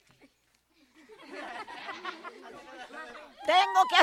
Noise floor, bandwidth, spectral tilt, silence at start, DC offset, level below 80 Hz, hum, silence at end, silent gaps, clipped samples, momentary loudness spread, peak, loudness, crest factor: -70 dBFS; 14 kHz; -0.5 dB/octave; 1.3 s; under 0.1%; -76 dBFS; none; 0 s; none; under 0.1%; 23 LU; -6 dBFS; -29 LUFS; 24 dB